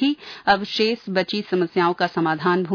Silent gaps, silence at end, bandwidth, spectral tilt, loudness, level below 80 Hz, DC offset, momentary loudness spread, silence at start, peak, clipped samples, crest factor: none; 0 s; 5.4 kHz; -6 dB/octave; -21 LUFS; -58 dBFS; under 0.1%; 3 LU; 0 s; -4 dBFS; under 0.1%; 18 dB